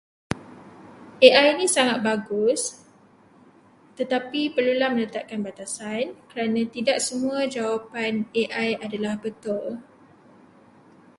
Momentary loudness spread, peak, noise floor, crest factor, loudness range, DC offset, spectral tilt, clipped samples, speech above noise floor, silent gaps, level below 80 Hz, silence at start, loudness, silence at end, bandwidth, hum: 15 LU; 0 dBFS; -54 dBFS; 24 dB; 7 LU; under 0.1%; -3 dB/octave; under 0.1%; 31 dB; none; -62 dBFS; 0.3 s; -23 LUFS; 1.35 s; 11.5 kHz; none